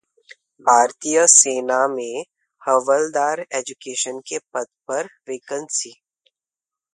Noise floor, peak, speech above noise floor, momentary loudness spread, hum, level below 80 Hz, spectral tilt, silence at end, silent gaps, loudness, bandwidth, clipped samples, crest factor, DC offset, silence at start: -90 dBFS; 0 dBFS; 70 dB; 18 LU; none; -76 dBFS; -0.5 dB/octave; 1.05 s; none; -19 LUFS; 11.5 kHz; under 0.1%; 22 dB; under 0.1%; 0.65 s